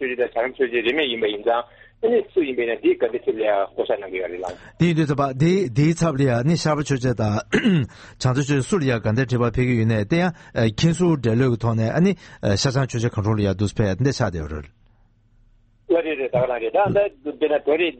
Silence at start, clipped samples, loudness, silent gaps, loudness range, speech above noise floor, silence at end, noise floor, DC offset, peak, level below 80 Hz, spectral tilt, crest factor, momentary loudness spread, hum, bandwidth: 0 s; under 0.1%; -21 LUFS; none; 4 LU; 36 dB; 0.05 s; -56 dBFS; under 0.1%; -4 dBFS; -44 dBFS; -6.5 dB/octave; 16 dB; 6 LU; none; 8.8 kHz